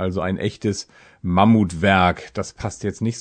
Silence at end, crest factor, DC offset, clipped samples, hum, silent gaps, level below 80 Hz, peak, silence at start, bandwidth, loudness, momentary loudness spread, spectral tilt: 0 s; 20 dB; under 0.1%; under 0.1%; none; none; -46 dBFS; 0 dBFS; 0 s; 9.4 kHz; -20 LUFS; 14 LU; -6 dB/octave